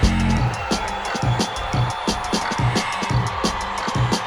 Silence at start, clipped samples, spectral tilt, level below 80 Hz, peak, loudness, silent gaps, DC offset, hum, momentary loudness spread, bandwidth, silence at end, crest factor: 0 s; under 0.1%; -5 dB/octave; -30 dBFS; -4 dBFS; -22 LUFS; none; under 0.1%; none; 3 LU; 16.5 kHz; 0 s; 18 dB